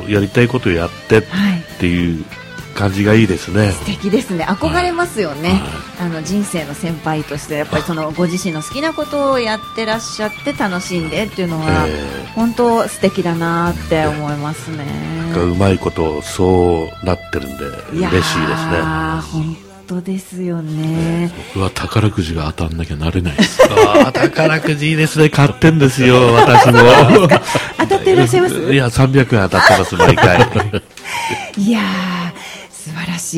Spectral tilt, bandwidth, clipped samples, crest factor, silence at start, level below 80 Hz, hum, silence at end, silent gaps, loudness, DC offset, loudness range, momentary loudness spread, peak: -5.5 dB/octave; 16.5 kHz; 0.7%; 14 dB; 0 s; -36 dBFS; none; 0 s; none; -14 LUFS; under 0.1%; 10 LU; 13 LU; 0 dBFS